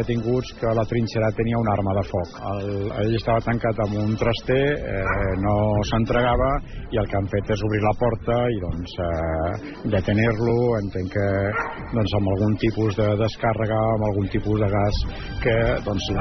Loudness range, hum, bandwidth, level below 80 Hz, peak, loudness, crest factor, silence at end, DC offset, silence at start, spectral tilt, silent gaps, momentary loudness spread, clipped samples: 2 LU; none; 6.4 kHz; -34 dBFS; -8 dBFS; -23 LUFS; 14 dB; 0 s; under 0.1%; 0 s; -6 dB/octave; none; 6 LU; under 0.1%